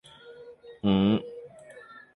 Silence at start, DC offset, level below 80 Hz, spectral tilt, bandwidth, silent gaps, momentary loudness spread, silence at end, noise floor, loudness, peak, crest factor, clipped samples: 0.25 s; under 0.1%; -56 dBFS; -8.5 dB/octave; 11 kHz; none; 25 LU; 0.35 s; -49 dBFS; -26 LUFS; -12 dBFS; 18 dB; under 0.1%